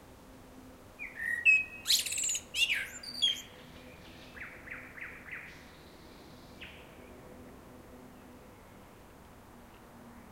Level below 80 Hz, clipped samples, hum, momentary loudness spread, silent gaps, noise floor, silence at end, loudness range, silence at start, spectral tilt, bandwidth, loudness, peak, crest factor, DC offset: -62 dBFS; under 0.1%; none; 27 LU; none; -54 dBFS; 0 s; 23 LU; 0 s; 0.5 dB/octave; 16 kHz; -29 LUFS; -14 dBFS; 24 dB; under 0.1%